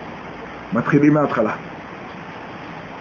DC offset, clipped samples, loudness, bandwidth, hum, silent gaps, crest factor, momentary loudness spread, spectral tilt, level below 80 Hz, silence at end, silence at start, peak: under 0.1%; under 0.1%; -18 LUFS; 7 kHz; none; none; 18 dB; 18 LU; -8.5 dB/octave; -52 dBFS; 0 s; 0 s; -2 dBFS